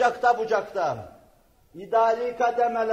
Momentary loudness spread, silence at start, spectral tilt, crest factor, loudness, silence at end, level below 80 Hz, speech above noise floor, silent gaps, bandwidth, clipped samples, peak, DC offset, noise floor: 7 LU; 0 s; -4.5 dB/octave; 16 dB; -24 LUFS; 0 s; -64 dBFS; 35 dB; none; 8.8 kHz; under 0.1%; -8 dBFS; under 0.1%; -59 dBFS